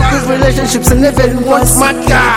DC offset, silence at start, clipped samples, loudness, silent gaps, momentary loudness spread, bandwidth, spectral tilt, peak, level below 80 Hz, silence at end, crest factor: under 0.1%; 0 s; under 0.1%; -9 LUFS; none; 3 LU; 17.5 kHz; -4.5 dB/octave; 0 dBFS; -18 dBFS; 0 s; 10 dB